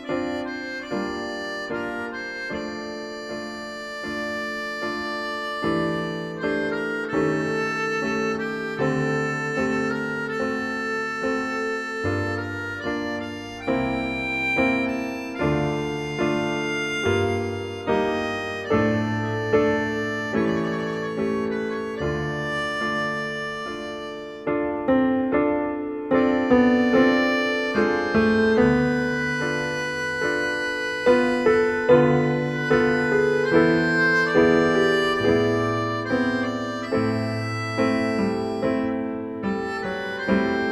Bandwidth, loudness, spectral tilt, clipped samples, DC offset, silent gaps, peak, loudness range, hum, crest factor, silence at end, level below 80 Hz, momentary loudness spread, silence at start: 12.5 kHz; -23 LUFS; -6 dB/octave; under 0.1%; under 0.1%; none; -4 dBFS; 8 LU; none; 18 dB; 0 s; -50 dBFS; 11 LU; 0 s